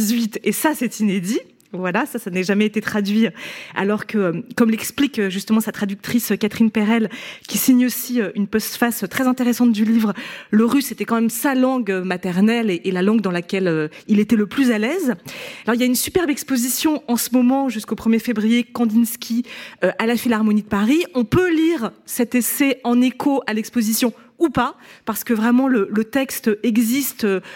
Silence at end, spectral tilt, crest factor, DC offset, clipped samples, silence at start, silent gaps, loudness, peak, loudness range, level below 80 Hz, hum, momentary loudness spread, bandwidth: 0 s; -4.5 dB/octave; 16 dB; under 0.1%; under 0.1%; 0 s; none; -19 LUFS; -2 dBFS; 2 LU; -54 dBFS; none; 7 LU; 17 kHz